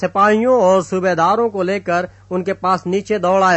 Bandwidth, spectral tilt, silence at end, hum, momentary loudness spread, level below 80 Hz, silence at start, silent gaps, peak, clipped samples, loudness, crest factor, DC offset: 8.4 kHz; -6 dB/octave; 0 s; none; 8 LU; -54 dBFS; 0 s; none; -2 dBFS; under 0.1%; -16 LUFS; 14 dB; under 0.1%